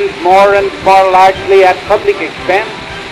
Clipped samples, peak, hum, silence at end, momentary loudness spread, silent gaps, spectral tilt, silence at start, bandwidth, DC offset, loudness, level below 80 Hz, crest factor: under 0.1%; 0 dBFS; none; 0 s; 8 LU; none; -4.5 dB/octave; 0 s; 13.5 kHz; under 0.1%; -9 LUFS; -38 dBFS; 8 dB